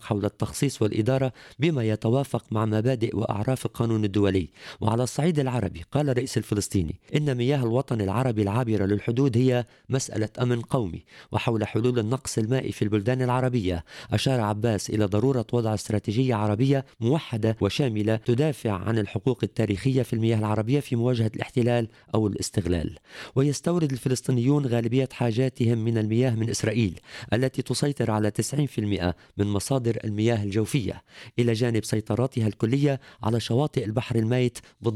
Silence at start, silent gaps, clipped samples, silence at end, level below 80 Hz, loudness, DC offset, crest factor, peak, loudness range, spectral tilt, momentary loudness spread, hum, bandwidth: 0 s; none; under 0.1%; 0 s; -52 dBFS; -25 LUFS; under 0.1%; 16 dB; -8 dBFS; 2 LU; -6.5 dB/octave; 5 LU; none; 14 kHz